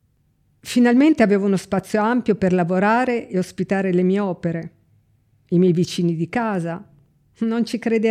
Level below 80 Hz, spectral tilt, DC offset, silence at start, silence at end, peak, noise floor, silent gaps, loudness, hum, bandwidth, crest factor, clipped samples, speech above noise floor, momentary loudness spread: -58 dBFS; -7 dB/octave; under 0.1%; 0.65 s; 0 s; -2 dBFS; -62 dBFS; none; -20 LUFS; none; 14.5 kHz; 16 dB; under 0.1%; 44 dB; 11 LU